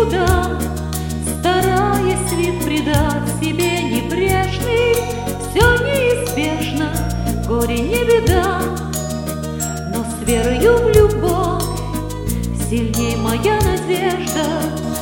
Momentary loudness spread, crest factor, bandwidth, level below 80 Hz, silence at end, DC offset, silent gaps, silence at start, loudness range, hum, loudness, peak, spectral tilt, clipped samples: 9 LU; 16 dB; 17.5 kHz; -28 dBFS; 0 s; under 0.1%; none; 0 s; 2 LU; none; -17 LUFS; 0 dBFS; -5 dB/octave; under 0.1%